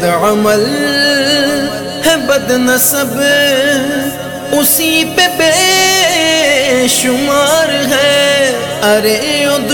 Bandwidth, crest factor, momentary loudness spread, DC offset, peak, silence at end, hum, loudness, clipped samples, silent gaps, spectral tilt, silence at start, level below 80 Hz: 18 kHz; 10 dB; 5 LU; 0.2%; 0 dBFS; 0 s; none; -10 LUFS; under 0.1%; none; -2 dB/octave; 0 s; -44 dBFS